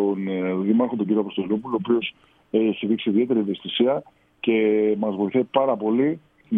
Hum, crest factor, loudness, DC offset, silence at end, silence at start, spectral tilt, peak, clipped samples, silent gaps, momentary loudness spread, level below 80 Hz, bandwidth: none; 16 dB; -23 LUFS; under 0.1%; 0 s; 0 s; -9.5 dB/octave; -6 dBFS; under 0.1%; none; 5 LU; -68 dBFS; 3.9 kHz